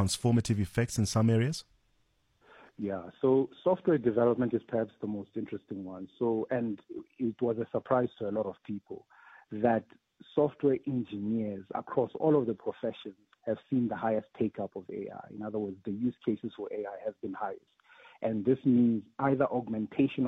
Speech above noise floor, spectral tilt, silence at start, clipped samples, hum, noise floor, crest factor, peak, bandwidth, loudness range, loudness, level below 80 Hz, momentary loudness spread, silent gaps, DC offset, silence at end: 41 dB; -6.5 dB/octave; 0 s; under 0.1%; none; -72 dBFS; 18 dB; -12 dBFS; 14 kHz; 5 LU; -32 LUFS; -62 dBFS; 13 LU; none; under 0.1%; 0 s